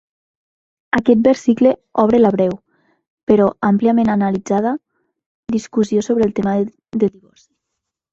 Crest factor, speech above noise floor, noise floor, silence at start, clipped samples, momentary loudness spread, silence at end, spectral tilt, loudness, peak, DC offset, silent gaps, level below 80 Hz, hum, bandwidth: 16 dB; 64 dB; -79 dBFS; 0.95 s; under 0.1%; 10 LU; 1.05 s; -7 dB/octave; -16 LUFS; 0 dBFS; under 0.1%; 3.10-3.17 s, 3.23-3.27 s, 5.26-5.43 s; -52 dBFS; none; 7.8 kHz